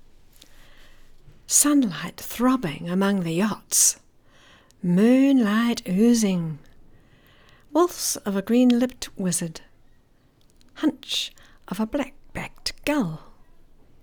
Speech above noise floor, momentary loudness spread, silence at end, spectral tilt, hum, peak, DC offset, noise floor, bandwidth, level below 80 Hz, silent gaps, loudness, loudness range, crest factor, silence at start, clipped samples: 36 dB; 15 LU; 0.85 s; -4 dB/octave; none; -4 dBFS; under 0.1%; -58 dBFS; over 20 kHz; -52 dBFS; none; -22 LUFS; 8 LU; 20 dB; 1.5 s; under 0.1%